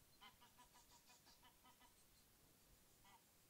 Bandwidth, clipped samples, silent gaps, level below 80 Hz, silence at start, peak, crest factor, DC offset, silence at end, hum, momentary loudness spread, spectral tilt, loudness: 16 kHz; under 0.1%; none; -82 dBFS; 0 s; -50 dBFS; 20 dB; under 0.1%; 0 s; none; 4 LU; -2 dB/octave; -69 LUFS